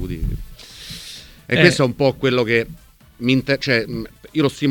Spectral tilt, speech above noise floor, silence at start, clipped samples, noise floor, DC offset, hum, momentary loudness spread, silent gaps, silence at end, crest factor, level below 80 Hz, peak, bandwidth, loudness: -5.5 dB/octave; 21 dB; 0 s; under 0.1%; -39 dBFS; under 0.1%; none; 19 LU; none; 0 s; 20 dB; -36 dBFS; 0 dBFS; 19 kHz; -18 LUFS